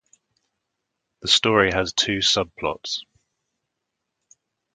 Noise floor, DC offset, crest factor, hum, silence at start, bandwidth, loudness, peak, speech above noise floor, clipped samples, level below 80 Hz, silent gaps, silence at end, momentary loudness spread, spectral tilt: -81 dBFS; under 0.1%; 24 dB; none; 1.25 s; 9.6 kHz; -20 LUFS; -2 dBFS; 59 dB; under 0.1%; -50 dBFS; none; 1.75 s; 13 LU; -2.5 dB/octave